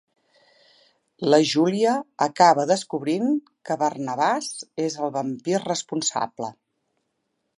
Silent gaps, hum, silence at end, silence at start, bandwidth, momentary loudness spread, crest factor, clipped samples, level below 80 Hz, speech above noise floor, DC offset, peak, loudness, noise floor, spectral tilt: none; none; 1.05 s; 1.2 s; 11.5 kHz; 11 LU; 20 dB; under 0.1%; -76 dBFS; 53 dB; under 0.1%; -4 dBFS; -23 LUFS; -76 dBFS; -4 dB/octave